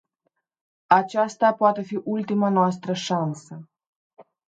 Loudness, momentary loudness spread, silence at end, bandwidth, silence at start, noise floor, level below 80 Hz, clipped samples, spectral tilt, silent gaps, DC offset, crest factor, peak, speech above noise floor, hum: -22 LUFS; 11 LU; 0.25 s; 9 kHz; 0.9 s; -76 dBFS; -74 dBFS; under 0.1%; -6 dB/octave; 3.87-4.10 s; under 0.1%; 22 dB; -2 dBFS; 53 dB; none